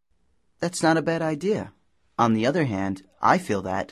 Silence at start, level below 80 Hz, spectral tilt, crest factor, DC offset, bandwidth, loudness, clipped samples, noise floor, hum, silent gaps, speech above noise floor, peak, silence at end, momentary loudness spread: 0.6 s; -56 dBFS; -5.5 dB/octave; 22 dB; under 0.1%; 13.5 kHz; -24 LUFS; under 0.1%; -70 dBFS; none; none; 47 dB; -4 dBFS; 0.05 s; 10 LU